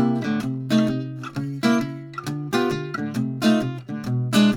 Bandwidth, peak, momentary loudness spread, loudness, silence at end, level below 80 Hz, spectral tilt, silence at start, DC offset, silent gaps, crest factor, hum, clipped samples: 17 kHz; -6 dBFS; 10 LU; -24 LUFS; 0 s; -56 dBFS; -6 dB/octave; 0 s; under 0.1%; none; 16 dB; none; under 0.1%